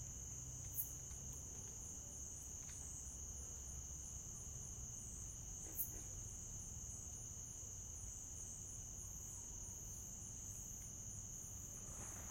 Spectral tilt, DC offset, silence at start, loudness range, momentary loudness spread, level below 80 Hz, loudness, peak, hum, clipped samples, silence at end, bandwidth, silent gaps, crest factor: -3 dB/octave; under 0.1%; 0 s; 1 LU; 5 LU; -60 dBFS; -49 LUFS; -28 dBFS; none; under 0.1%; 0 s; 16.5 kHz; none; 24 dB